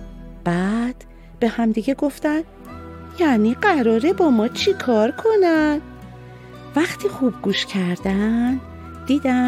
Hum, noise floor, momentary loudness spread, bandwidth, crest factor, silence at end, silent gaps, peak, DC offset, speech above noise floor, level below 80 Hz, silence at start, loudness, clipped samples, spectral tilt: none; -39 dBFS; 20 LU; 14.5 kHz; 16 dB; 0 s; none; -4 dBFS; under 0.1%; 20 dB; -44 dBFS; 0 s; -20 LUFS; under 0.1%; -6 dB/octave